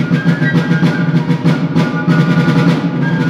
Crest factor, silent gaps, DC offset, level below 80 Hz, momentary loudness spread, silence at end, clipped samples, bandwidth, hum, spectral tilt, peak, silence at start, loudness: 12 dB; none; under 0.1%; -48 dBFS; 3 LU; 0 s; under 0.1%; 7.6 kHz; none; -8 dB/octave; 0 dBFS; 0 s; -13 LUFS